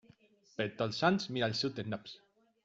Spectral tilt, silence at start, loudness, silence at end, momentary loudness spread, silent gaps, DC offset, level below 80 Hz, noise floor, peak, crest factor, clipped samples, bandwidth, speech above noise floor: -5.5 dB/octave; 0.6 s; -34 LUFS; 0.5 s; 18 LU; none; under 0.1%; -72 dBFS; -65 dBFS; -14 dBFS; 24 dB; under 0.1%; 7.8 kHz; 31 dB